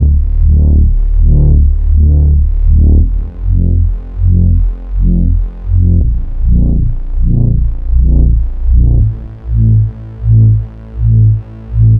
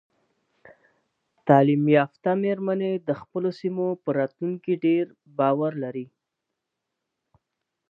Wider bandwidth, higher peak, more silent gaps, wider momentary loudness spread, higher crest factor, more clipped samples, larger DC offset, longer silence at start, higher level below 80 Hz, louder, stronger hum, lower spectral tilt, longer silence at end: second, 1.5 kHz vs 5.8 kHz; first, 0 dBFS vs -4 dBFS; neither; second, 8 LU vs 13 LU; second, 8 dB vs 22 dB; neither; neither; second, 0 s vs 1.45 s; first, -10 dBFS vs -74 dBFS; first, -12 LUFS vs -24 LUFS; neither; first, -13.5 dB/octave vs -10 dB/octave; second, 0 s vs 1.85 s